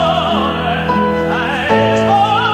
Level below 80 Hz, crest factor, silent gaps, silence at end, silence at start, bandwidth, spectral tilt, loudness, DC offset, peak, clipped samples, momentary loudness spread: -36 dBFS; 12 dB; none; 0 s; 0 s; 15.5 kHz; -6 dB/octave; -14 LUFS; 0.2%; -2 dBFS; under 0.1%; 4 LU